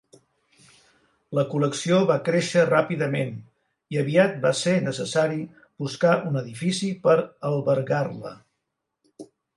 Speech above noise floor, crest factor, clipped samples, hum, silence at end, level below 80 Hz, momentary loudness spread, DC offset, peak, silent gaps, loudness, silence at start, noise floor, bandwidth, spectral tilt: 57 dB; 18 dB; under 0.1%; none; 0.3 s; -70 dBFS; 12 LU; under 0.1%; -6 dBFS; none; -23 LUFS; 1.3 s; -80 dBFS; 11.5 kHz; -5.5 dB/octave